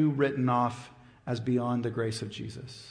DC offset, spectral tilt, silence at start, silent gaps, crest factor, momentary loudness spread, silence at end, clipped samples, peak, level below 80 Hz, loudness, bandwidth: under 0.1%; -7 dB/octave; 0 s; none; 16 dB; 17 LU; 0 s; under 0.1%; -14 dBFS; -64 dBFS; -30 LUFS; 10.5 kHz